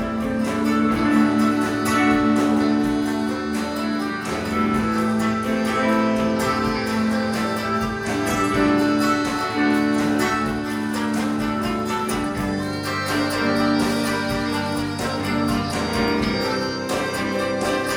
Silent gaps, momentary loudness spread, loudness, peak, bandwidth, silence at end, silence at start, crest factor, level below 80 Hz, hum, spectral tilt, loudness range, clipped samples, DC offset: none; 6 LU; -21 LUFS; -6 dBFS; 17 kHz; 0 s; 0 s; 14 dB; -44 dBFS; none; -5 dB/octave; 3 LU; under 0.1%; under 0.1%